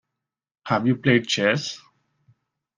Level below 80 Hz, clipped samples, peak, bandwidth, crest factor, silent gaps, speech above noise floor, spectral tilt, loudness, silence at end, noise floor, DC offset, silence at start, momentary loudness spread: -62 dBFS; under 0.1%; -4 dBFS; 10 kHz; 20 dB; none; 63 dB; -5 dB/octave; -22 LUFS; 1 s; -85 dBFS; under 0.1%; 0.65 s; 18 LU